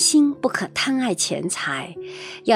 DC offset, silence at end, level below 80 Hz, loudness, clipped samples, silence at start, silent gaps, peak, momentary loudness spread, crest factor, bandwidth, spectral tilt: under 0.1%; 0 s; -66 dBFS; -22 LUFS; under 0.1%; 0 s; none; -4 dBFS; 15 LU; 18 dB; 16 kHz; -2.5 dB/octave